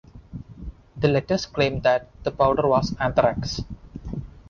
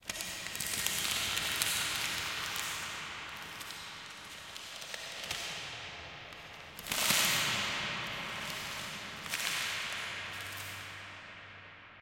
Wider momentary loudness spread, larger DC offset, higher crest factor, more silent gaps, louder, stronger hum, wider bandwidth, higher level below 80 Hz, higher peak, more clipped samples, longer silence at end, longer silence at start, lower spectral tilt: first, 20 LU vs 15 LU; neither; second, 18 dB vs 28 dB; neither; first, -23 LUFS vs -35 LUFS; neither; second, 7.2 kHz vs 17 kHz; first, -42 dBFS vs -64 dBFS; about the same, -6 dBFS vs -8 dBFS; neither; about the same, 0.1 s vs 0 s; first, 0.15 s vs 0 s; first, -6 dB/octave vs -0.5 dB/octave